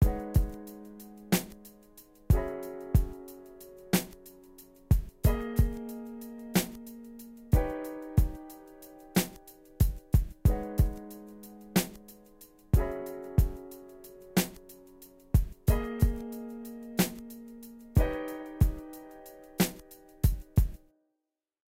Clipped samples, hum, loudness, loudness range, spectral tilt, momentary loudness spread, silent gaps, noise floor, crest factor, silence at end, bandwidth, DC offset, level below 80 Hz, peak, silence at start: under 0.1%; none; -31 LUFS; 2 LU; -6 dB/octave; 20 LU; none; -86 dBFS; 20 dB; 0.95 s; 16 kHz; under 0.1%; -34 dBFS; -10 dBFS; 0 s